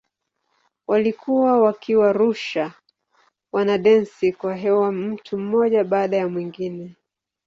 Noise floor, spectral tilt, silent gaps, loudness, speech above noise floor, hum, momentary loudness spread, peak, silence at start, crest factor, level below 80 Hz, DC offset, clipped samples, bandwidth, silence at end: -74 dBFS; -7 dB/octave; none; -20 LUFS; 55 dB; none; 13 LU; -4 dBFS; 0.9 s; 16 dB; -66 dBFS; under 0.1%; under 0.1%; 7.4 kHz; 0.55 s